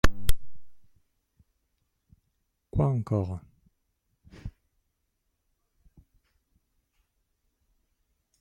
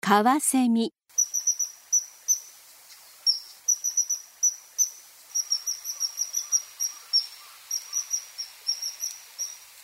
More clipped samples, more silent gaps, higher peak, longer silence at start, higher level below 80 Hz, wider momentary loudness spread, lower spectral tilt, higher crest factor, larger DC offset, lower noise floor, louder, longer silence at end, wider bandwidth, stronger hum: neither; neither; about the same, -6 dBFS vs -6 dBFS; about the same, 0.05 s vs 0.05 s; first, -38 dBFS vs -84 dBFS; first, 19 LU vs 11 LU; first, -6 dB/octave vs -1 dB/octave; about the same, 24 dB vs 22 dB; neither; first, -78 dBFS vs -50 dBFS; second, -30 LUFS vs -26 LUFS; first, 3.9 s vs 0 s; about the same, 16 kHz vs 16 kHz; neither